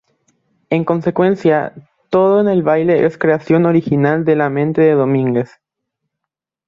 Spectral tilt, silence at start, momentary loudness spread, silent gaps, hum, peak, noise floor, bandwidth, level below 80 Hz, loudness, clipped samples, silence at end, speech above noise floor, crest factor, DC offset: -9.5 dB/octave; 0.7 s; 6 LU; none; none; -2 dBFS; -81 dBFS; 7.2 kHz; -56 dBFS; -14 LUFS; under 0.1%; 1.25 s; 68 dB; 14 dB; under 0.1%